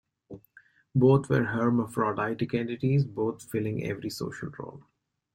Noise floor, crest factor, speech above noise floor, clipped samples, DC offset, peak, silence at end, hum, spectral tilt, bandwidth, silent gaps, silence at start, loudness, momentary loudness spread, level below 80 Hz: -60 dBFS; 18 dB; 32 dB; under 0.1%; under 0.1%; -10 dBFS; 0.55 s; none; -7.5 dB/octave; 16.5 kHz; none; 0.3 s; -28 LUFS; 17 LU; -62 dBFS